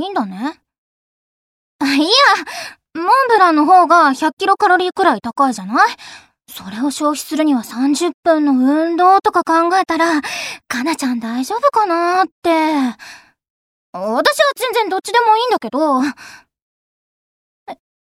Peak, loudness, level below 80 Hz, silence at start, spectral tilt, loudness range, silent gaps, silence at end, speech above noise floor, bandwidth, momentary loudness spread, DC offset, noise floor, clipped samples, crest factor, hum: 0 dBFS; -14 LUFS; -64 dBFS; 0 s; -3 dB/octave; 5 LU; 0.78-1.79 s, 4.33-4.37 s, 8.14-8.23 s, 12.32-12.42 s, 13.50-13.93 s, 16.62-17.66 s; 0.4 s; over 75 dB; 16.5 kHz; 13 LU; under 0.1%; under -90 dBFS; under 0.1%; 16 dB; none